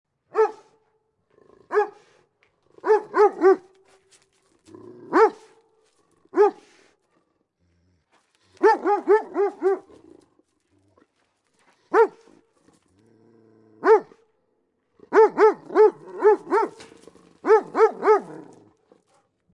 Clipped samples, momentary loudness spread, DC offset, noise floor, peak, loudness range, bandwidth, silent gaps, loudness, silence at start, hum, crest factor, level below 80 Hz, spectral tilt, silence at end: under 0.1%; 9 LU; under 0.1%; -71 dBFS; -6 dBFS; 7 LU; 8 kHz; none; -21 LUFS; 0.35 s; none; 18 dB; -80 dBFS; -5.5 dB/octave; 1.1 s